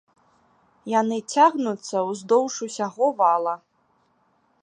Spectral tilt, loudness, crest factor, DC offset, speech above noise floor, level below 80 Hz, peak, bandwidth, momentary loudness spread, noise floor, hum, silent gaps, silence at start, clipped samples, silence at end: -4 dB/octave; -22 LUFS; 20 dB; under 0.1%; 44 dB; -80 dBFS; -4 dBFS; 10.5 kHz; 10 LU; -66 dBFS; none; none; 0.85 s; under 0.1%; 1.05 s